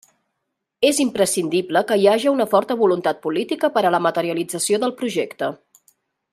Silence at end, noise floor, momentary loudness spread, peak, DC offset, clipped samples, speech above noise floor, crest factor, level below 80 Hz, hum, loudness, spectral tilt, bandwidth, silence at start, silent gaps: 0.75 s; -78 dBFS; 8 LU; -2 dBFS; under 0.1%; under 0.1%; 59 dB; 18 dB; -68 dBFS; none; -19 LUFS; -3.5 dB/octave; 15.5 kHz; 0.8 s; none